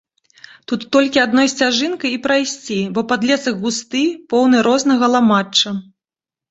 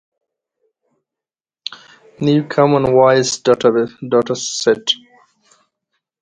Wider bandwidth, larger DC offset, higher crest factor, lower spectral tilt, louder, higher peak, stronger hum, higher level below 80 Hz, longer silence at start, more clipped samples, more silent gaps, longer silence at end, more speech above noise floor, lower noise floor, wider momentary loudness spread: second, 8.2 kHz vs 9.6 kHz; neither; about the same, 16 dB vs 18 dB; about the same, -3.5 dB/octave vs -4.5 dB/octave; about the same, -16 LUFS vs -15 LUFS; about the same, -2 dBFS vs 0 dBFS; neither; about the same, -60 dBFS vs -56 dBFS; second, 0.7 s vs 1.7 s; neither; neither; second, 0.7 s vs 1.25 s; about the same, 74 dB vs 75 dB; about the same, -90 dBFS vs -89 dBFS; second, 8 LU vs 15 LU